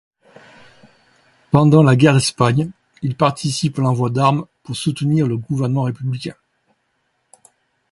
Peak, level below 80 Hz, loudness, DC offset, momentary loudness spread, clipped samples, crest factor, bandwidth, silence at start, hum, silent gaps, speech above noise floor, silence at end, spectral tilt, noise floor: 0 dBFS; -52 dBFS; -17 LUFS; under 0.1%; 14 LU; under 0.1%; 18 dB; 11.5 kHz; 1.55 s; none; none; 52 dB; 1.6 s; -6.5 dB/octave; -68 dBFS